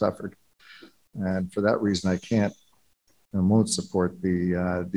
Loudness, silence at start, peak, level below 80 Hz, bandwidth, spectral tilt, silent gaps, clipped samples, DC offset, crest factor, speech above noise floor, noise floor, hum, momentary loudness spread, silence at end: -26 LUFS; 0 s; -8 dBFS; -56 dBFS; 12 kHz; -6 dB/octave; none; under 0.1%; under 0.1%; 18 dB; 42 dB; -67 dBFS; none; 10 LU; 0 s